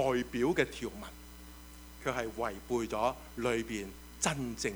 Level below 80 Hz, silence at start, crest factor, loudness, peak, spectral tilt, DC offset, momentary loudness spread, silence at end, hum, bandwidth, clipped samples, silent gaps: -52 dBFS; 0 s; 22 dB; -35 LUFS; -14 dBFS; -4 dB/octave; under 0.1%; 19 LU; 0 s; none; over 20 kHz; under 0.1%; none